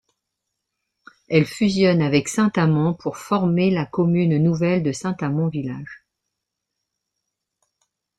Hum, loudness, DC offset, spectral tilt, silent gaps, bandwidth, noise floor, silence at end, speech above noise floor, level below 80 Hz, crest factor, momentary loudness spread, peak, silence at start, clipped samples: none; -20 LUFS; under 0.1%; -6.5 dB/octave; none; 12 kHz; -81 dBFS; 2.2 s; 62 dB; -58 dBFS; 18 dB; 8 LU; -2 dBFS; 1.3 s; under 0.1%